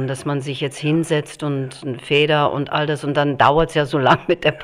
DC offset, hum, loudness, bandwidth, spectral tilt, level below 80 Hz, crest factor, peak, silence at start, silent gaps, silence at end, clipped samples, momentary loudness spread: under 0.1%; none; -19 LUFS; 13.5 kHz; -6 dB/octave; -44 dBFS; 18 dB; 0 dBFS; 0 s; none; 0 s; under 0.1%; 10 LU